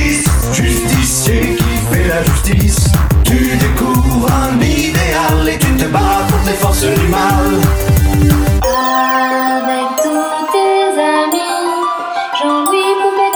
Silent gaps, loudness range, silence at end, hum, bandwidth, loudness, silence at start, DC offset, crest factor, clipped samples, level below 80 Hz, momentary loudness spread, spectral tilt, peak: none; 2 LU; 0 s; none; over 20 kHz; -12 LUFS; 0 s; under 0.1%; 12 dB; under 0.1%; -18 dBFS; 3 LU; -5 dB/octave; 0 dBFS